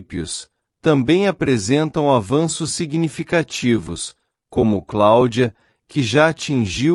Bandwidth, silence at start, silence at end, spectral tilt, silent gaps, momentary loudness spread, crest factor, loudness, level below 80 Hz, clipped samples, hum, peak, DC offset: 12 kHz; 0 s; 0 s; -5.5 dB/octave; none; 11 LU; 16 dB; -18 LUFS; -48 dBFS; under 0.1%; none; -2 dBFS; under 0.1%